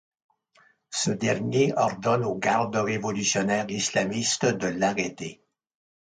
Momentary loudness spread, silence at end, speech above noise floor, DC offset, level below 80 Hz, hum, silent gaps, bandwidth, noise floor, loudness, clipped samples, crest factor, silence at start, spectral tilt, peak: 5 LU; 0.75 s; 37 dB; under 0.1%; -64 dBFS; none; none; 10 kHz; -62 dBFS; -25 LUFS; under 0.1%; 16 dB; 0.9 s; -4 dB/octave; -10 dBFS